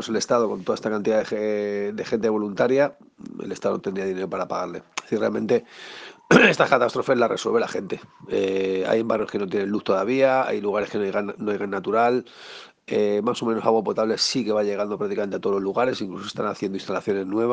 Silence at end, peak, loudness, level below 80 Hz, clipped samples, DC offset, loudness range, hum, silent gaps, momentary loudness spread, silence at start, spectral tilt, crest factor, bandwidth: 0 s; 0 dBFS; -23 LUFS; -64 dBFS; under 0.1%; under 0.1%; 5 LU; none; none; 11 LU; 0 s; -5 dB/octave; 22 dB; 9.6 kHz